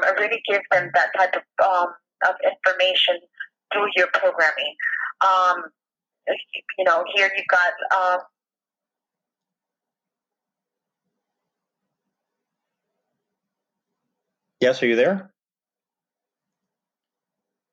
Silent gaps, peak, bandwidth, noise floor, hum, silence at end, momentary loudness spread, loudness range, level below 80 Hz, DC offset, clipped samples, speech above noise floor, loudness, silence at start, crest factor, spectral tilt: none; -6 dBFS; 7.8 kHz; under -90 dBFS; none; 2.5 s; 10 LU; 6 LU; -86 dBFS; under 0.1%; under 0.1%; over 69 dB; -20 LUFS; 0 s; 18 dB; -3.5 dB/octave